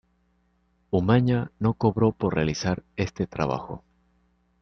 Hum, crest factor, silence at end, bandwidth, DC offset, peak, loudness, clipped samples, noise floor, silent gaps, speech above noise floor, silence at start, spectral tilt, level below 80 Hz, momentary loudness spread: 60 Hz at -45 dBFS; 20 dB; 0.85 s; 6.6 kHz; under 0.1%; -6 dBFS; -25 LUFS; under 0.1%; -68 dBFS; none; 43 dB; 0.9 s; -7 dB/octave; -50 dBFS; 10 LU